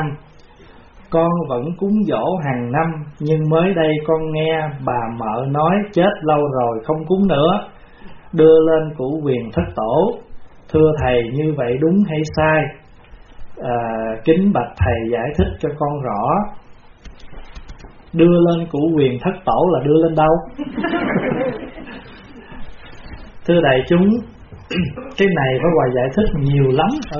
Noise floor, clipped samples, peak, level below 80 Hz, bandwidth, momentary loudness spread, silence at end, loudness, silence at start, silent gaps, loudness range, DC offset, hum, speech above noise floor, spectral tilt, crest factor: -43 dBFS; under 0.1%; 0 dBFS; -36 dBFS; 6.8 kHz; 10 LU; 0 s; -17 LUFS; 0 s; none; 4 LU; under 0.1%; none; 27 dB; -6 dB/octave; 16 dB